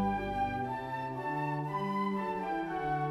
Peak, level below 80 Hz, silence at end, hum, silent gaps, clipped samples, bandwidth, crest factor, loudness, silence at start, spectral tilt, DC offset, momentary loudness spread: -22 dBFS; -54 dBFS; 0 s; none; none; under 0.1%; 13.5 kHz; 12 dB; -35 LUFS; 0 s; -7.5 dB/octave; under 0.1%; 3 LU